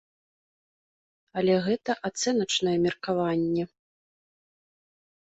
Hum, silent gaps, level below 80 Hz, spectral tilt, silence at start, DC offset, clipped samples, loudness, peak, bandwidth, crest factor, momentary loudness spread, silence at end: none; none; -66 dBFS; -4.5 dB/octave; 1.35 s; under 0.1%; under 0.1%; -26 LUFS; -12 dBFS; 8.2 kHz; 18 dB; 6 LU; 1.65 s